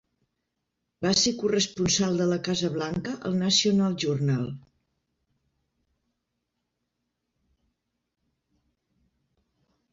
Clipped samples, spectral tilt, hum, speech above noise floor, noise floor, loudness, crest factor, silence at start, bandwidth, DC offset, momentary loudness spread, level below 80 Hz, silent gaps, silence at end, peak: under 0.1%; -4 dB/octave; none; 56 dB; -81 dBFS; -25 LUFS; 20 dB; 1 s; 7.8 kHz; under 0.1%; 9 LU; -60 dBFS; none; 5.35 s; -10 dBFS